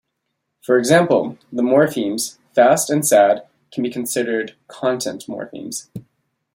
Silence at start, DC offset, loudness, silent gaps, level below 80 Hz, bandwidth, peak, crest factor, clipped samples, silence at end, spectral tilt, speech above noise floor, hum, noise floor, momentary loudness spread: 0.7 s; under 0.1%; -18 LUFS; none; -64 dBFS; 16.5 kHz; -2 dBFS; 18 dB; under 0.1%; 0.55 s; -4 dB/octave; 57 dB; none; -75 dBFS; 16 LU